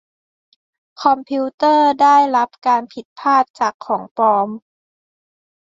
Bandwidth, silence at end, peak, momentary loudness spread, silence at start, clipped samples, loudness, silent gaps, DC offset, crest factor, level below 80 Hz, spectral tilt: 7.8 kHz; 1.1 s; -2 dBFS; 11 LU; 1 s; under 0.1%; -16 LUFS; 1.54-1.58 s, 3.05-3.16 s, 3.50-3.54 s, 3.74-3.79 s, 4.11-4.15 s; under 0.1%; 16 dB; -68 dBFS; -4.5 dB/octave